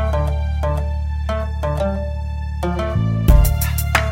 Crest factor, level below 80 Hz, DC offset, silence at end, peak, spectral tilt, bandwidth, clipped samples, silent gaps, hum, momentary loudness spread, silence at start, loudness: 18 dB; -20 dBFS; under 0.1%; 0 s; 0 dBFS; -6 dB/octave; 16.5 kHz; under 0.1%; none; none; 9 LU; 0 s; -20 LUFS